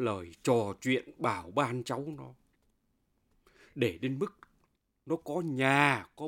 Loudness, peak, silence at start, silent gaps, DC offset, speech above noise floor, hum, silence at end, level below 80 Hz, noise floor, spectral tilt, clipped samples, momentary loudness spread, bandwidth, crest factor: -31 LUFS; -8 dBFS; 0 s; none; under 0.1%; 44 dB; none; 0 s; -68 dBFS; -75 dBFS; -5.5 dB/octave; under 0.1%; 12 LU; 16.5 kHz; 24 dB